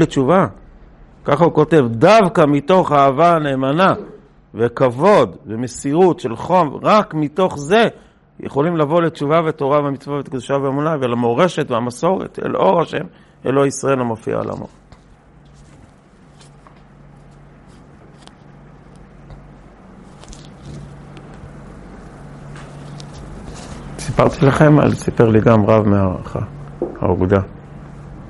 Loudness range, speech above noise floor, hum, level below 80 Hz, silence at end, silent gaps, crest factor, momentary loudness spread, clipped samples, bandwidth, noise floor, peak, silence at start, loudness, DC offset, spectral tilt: 20 LU; 31 dB; none; -44 dBFS; 0 s; none; 18 dB; 24 LU; under 0.1%; 11.5 kHz; -46 dBFS; 0 dBFS; 0 s; -16 LUFS; under 0.1%; -7 dB/octave